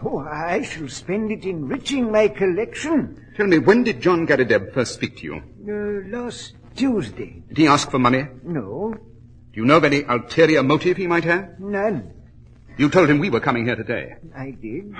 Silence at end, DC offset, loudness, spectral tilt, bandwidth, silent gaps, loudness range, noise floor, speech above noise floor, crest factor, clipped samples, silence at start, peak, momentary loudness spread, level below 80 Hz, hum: 0 s; under 0.1%; -20 LUFS; -5.5 dB/octave; 10 kHz; none; 4 LU; -45 dBFS; 25 dB; 20 dB; under 0.1%; 0 s; 0 dBFS; 16 LU; -48 dBFS; none